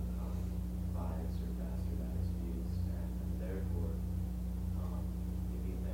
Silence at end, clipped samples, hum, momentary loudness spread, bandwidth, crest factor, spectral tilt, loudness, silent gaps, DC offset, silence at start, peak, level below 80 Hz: 0 s; under 0.1%; none; 2 LU; 16 kHz; 10 dB; -8.5 dB/octave; -40 LUFS; none; under 0.1%; 0 s; -26 dBFS; -40 dBFS